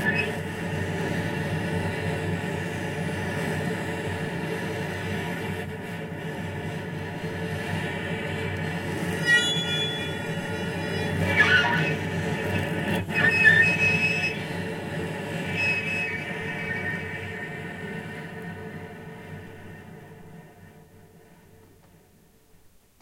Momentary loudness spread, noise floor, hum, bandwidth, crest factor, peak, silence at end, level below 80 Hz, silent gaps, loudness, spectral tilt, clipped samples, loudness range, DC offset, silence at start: 17 LU; -57 dBFS; none; 16 kHz; 22 dB; -6 dBFS; 0.35 s; -56 dBFS; none; -26 LUFS; -5 dB/octave; under 0.1%; 16 LU; under 0.1%; 0 s